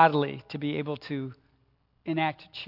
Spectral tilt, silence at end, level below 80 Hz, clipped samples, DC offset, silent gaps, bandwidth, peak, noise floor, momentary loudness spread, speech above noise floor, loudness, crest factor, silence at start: -8.5 dB/octave; 0 s; -70 dBFS; under 0.1%; under 0.1%; none; 5.8 kHz; -6 dBFS; -68 dBFS; 8 LU; 40 dB; -30 LUFS; 24 dB; 0 s